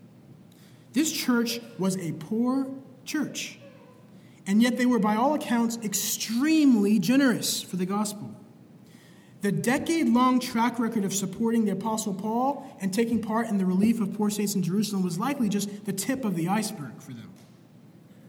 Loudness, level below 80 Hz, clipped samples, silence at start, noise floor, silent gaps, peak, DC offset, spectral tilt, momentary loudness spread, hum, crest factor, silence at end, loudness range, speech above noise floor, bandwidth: -26 LUFS; -70 dBFS; under 0.1%; 0.05 s; -52 dBFS; none; -10 dBFS; under 0.1%; -4.5 dB/octave; 10 LU; none; 16 dB; 0 s; 5 LU; 27 dB; 19 kHz